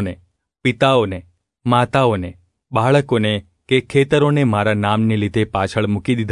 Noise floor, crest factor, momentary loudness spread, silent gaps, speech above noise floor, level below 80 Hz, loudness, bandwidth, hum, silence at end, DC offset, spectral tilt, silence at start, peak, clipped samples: -53 dBFS; 16 dB; 10 LU; none; 37 dB; -50 dBFS; -17 LUFS; 11 kHz; none; 0 s; under 0.1%; -7 dB/octave; 0 s; -2 dBFS; under 0.1%